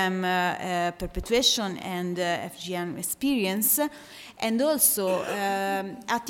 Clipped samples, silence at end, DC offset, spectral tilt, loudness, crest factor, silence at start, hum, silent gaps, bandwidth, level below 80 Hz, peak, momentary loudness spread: under 0.1%; 0 s; under 0.1%; -3 dB/octave; -26 LUFS; 20 dB; 0 s; none; none; 17 kHz; -50 dBFS; -6 dBFS; 11 LU